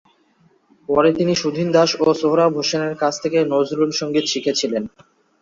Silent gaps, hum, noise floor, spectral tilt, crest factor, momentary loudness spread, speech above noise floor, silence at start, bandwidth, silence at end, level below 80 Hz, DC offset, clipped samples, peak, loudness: none; none; -58 dBFS; -4.5 dB/octave; 16 dB; 5 LU; 40 dB; 0.9 s; 7.6 kHz; 0.55 s; -58 dBFS; under 0.1%; under 0.1%; -2 dBFS; -18 LUFS